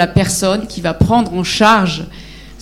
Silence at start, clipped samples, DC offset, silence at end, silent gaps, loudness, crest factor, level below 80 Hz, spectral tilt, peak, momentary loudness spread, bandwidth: 0 s; under 0.1%; under 0.1%; 0 s; none; -14 LUFS; 14 dB; -32 dBFS; -4.5 dB/octave; 0 dBFS; 10 LU; 16 kHz